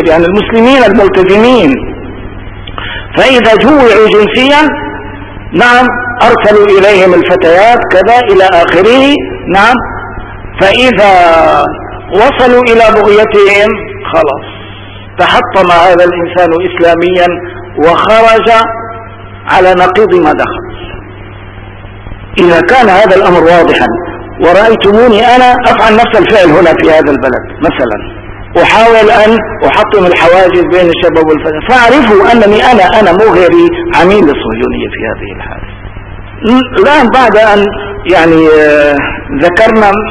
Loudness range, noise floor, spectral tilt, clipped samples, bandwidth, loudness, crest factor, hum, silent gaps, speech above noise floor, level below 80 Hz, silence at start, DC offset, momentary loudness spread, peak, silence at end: 4 LU; -25 dBFS; -5.5 dB/octave; 10%; 11 kHz; -5 LUFS; 6 dB; none; none; 21 dB; -28 dBFS; 0 s; under 0.1%; 17 LU; 0 dBFS; 0 s